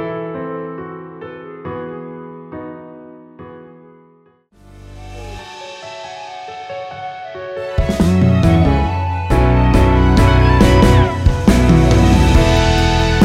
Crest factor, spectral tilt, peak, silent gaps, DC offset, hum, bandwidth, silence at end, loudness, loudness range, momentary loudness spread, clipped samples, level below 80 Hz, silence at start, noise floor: 14 dB; -6.5 dB/octave; 0 dBFS; none; under 0.1%; none; 14 kHz; 0 s; -13 LUFS; 23 LU; 20 LU; under 0.1%; -20 dBFS; 0 s; -52 dBFS